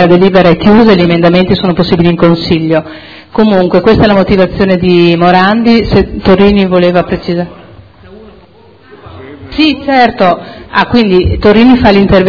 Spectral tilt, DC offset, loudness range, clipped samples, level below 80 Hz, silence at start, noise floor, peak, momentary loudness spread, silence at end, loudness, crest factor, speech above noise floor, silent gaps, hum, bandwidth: -8.5 dB/octave; under 0.1%; 6 LU; 4%; -28 dBFS; 0 s; -39 dBFS; 0 dBFS; 9 LU; 0 s; -7 LUFS; 8 dB; 32 dB; none; none; 5.4 kHz